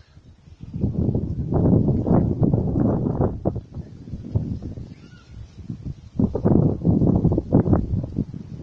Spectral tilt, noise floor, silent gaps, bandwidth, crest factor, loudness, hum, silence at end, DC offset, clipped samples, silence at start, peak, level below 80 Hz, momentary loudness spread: -12 dB/octave; -48 dBFS; none; 6 kHz; 18 dB; -22 LUFS; none; 0 s; under 0.1%; under 0.1%; 0.3 s; -4 dBFS; -36 dBFS; 18 LU